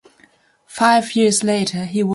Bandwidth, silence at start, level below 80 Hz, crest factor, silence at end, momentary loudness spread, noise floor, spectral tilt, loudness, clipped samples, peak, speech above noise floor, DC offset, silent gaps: 11.5 kHz; 0.7 s; -62 dBFS; 16 dB; 0 s; 6 LU; -54 dBFS; -4 dB/octave; -17 LUFS; under 0.1%; -2 dBFS; 38 dB; under 0.1%; none